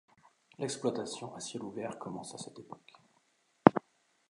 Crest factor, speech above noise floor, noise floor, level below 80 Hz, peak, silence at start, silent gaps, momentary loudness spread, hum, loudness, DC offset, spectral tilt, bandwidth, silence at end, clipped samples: 34 dB; 33 dB; -73 dBFS; -68 dBFS; 0 dBFS; 0.6 s; none; 21 LU; none; -33 LUFS; under 0.1%; -5.5 dB/octave; 11.5 kHz; 0.5 s; under 0.1%